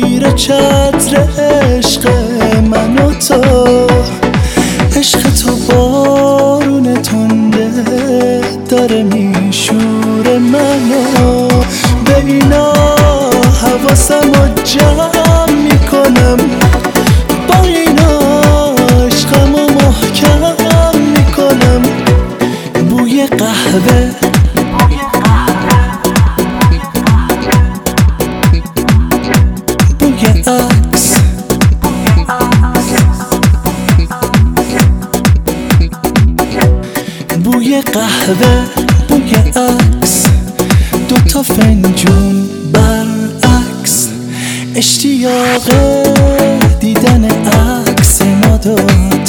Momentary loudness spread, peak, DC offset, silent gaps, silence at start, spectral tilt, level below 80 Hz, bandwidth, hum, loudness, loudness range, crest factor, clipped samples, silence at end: 4 LU; 0 dBFS; under 0.1%; none; 0 s; -5 dB/octave; -16 dBFS; over 20 kHz; none; -9 LUFS; 3 LU; 8 dB; 0.2%; 0 s